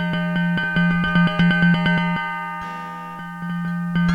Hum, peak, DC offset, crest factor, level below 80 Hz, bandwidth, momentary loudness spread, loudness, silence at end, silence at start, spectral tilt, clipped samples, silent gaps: none; -6 dBFS; under 0.1%; 14 dB; -44 dBFS; 5.2 kHz; 14 LU; -20 LUFS; 0 s; 0 s; -7.5 dB/octave; under 0.1%; none